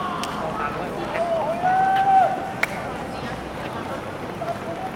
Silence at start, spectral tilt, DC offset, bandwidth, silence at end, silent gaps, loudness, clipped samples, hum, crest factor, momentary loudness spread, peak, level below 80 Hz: 0 s; -5 dB/octave; under 0.1%; 16 kHz; 0 s; none; -24 LUFS; under 0.1%; none; 20 dB; 13 LU; -4 dBFS; -48 dBFS